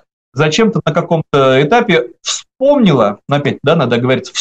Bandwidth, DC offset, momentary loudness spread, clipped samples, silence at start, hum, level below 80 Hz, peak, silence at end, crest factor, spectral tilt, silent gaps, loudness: 9 kHz; under 0.1%; 6 LU; under 0.1%; 0.35 s; none; -50 dBFS; -2 dBFS; 0 s; 12 dB; -5.5 dB/octave; none; -12 LUFS